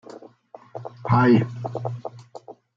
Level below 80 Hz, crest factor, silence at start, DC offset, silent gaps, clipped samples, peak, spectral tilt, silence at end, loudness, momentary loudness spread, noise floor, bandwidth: -62 dBFS; 18 dB; 0.1 s; under 0.1%; none; under 0.1%; -6 dBFS; -9 dB/octave; 0.25 s; -21 LUFS; 26 LU; -48 dBFS; 7.2 kHz